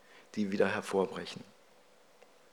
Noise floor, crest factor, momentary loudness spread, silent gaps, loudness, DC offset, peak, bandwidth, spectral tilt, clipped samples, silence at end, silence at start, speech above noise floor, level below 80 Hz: -63 dBFS; 22 dB; 14 LU; none; -34 LUFS; under 0.1%; -16 dBFS; 19.5 kHz; -5.5 dB/octave; under 0.1%; 1.1 s; 0.15 s; 30 dB; -84 dBFS